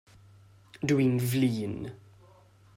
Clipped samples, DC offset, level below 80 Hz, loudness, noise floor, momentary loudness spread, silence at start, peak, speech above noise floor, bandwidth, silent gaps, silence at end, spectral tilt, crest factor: under 0.1%; under 0.1%; -62 dBFS; -28 LUFS; -58 dBFS; 13 LU; 0.75 s; -14 dBFS; 31 dB; 16 kHz; none; 0.8 s; -6.5 dB/octave; 16 dB